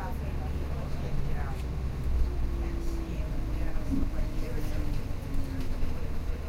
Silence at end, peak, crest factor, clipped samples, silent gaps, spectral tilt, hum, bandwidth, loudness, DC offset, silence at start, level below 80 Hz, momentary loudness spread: 0 s; -16 dBFS; 14 dB; under 0.1%; none; -7 dB/octave; none; 15 kHz; -35 LUFS; under 0.1%; 0 s; -30 dBFS; 4 LU